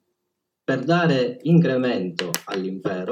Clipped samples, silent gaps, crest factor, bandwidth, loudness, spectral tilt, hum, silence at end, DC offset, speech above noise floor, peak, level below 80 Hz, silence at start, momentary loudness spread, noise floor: under 0.1%; none; 22 dB; 16.5 kHz; -22 LUFS; -6 dB/octave; none; 0 s; under 0.1%; 58 dB; 0 dBFS; -76 dBFS; 0.7 s; 9 LU; -79 dBFS